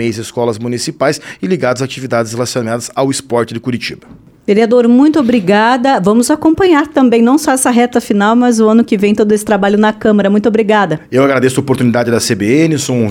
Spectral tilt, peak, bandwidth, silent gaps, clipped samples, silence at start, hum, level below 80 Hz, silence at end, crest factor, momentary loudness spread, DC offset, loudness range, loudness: -5 dB/octave; 0 dBFS; 16.5 kHz; none; under 0.1%; 0 s; none; -48 dBFS; 0 s; 10 dB; 8 LU; under 0.1%; 6 LU; -11 LUFS